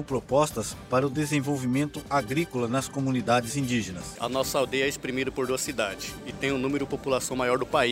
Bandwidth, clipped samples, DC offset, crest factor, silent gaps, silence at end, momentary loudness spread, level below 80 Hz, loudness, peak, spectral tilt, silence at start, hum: 16 kHz; under 0.1%; under 0.1%; 18 dB; none; 0 s; 5 LU; -52 dBFS; -27 LUFS; -8 dBFS; -4.5 dB/octave; 0 s; none